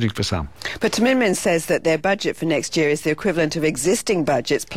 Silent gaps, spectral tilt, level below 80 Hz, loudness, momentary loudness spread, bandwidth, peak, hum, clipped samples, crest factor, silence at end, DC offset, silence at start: none; -4.5 dB/octave; -46 dBFS; -20 LUFS; 5 LU; 16.5 kHz; -8 dBFS; none; under 0.1%; 12 dB; 0 s; 0.6%; 0 s